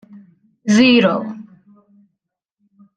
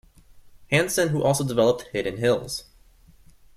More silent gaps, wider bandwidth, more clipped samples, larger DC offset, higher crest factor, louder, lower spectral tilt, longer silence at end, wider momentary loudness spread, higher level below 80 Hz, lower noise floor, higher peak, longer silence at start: neither; second, 9.2 kHz vs 15.5 kHz; neither; neither; about the same, 18 dB vs 20 dB; first, -14 LUFS vs -23 LUFS; about the same, -5 dB/octave vs -4.5 dB/octave; first, 1.55 s vs 0.95 s; first, 20 LU vs 8 LU; second, -64 dBFS vs -54 dBFS; first, -77 dBFS vs -54 dBFS; first, -2 dBFS vs -6 dBFS; first, 0.65 s vs 0.35 s